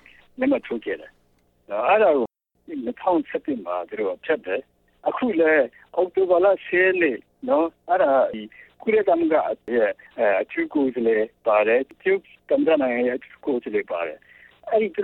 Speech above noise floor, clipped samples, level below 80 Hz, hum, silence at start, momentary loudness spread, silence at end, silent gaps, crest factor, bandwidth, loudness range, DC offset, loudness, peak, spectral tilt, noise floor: 40 dB; under 0.1%; -64 dBFS; none; 0.4 s; 12 LU; 0 s; none; 16 dB; 4.2 kHz; 3 LU; under 0.1%; -22 LUFS; -6 dBFS; -8 dB/octave; -61 dBFS